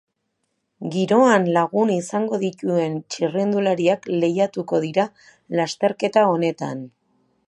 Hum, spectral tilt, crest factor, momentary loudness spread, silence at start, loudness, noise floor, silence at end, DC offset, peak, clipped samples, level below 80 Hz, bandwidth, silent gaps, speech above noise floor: none; -6 dB/octave; 18 dB; 10 LU; 0.8 s; -21 LUFS; -74 dBFS; 0.6 s; under 0.1%; -2 dBFS; under 0.1%; -72 dBFS; 11.5 kHz; none; 54 dB